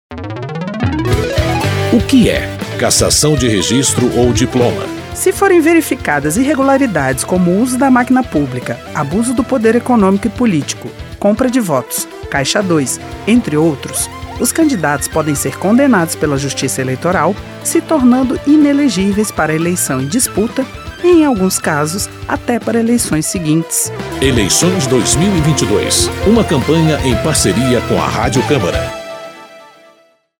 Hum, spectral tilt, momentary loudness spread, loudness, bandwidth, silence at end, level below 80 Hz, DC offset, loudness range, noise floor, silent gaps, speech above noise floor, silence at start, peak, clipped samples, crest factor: none; -4.5 dB/octave; 9 LU; -13 LUFS; 17.5 kHz; 0.75 s; -32 dBFS; under 0.1%; 3 LU; -50 dBFS; none; 38 dB; 0.1 s; 0 dBFS; under 0.1%; 12 dB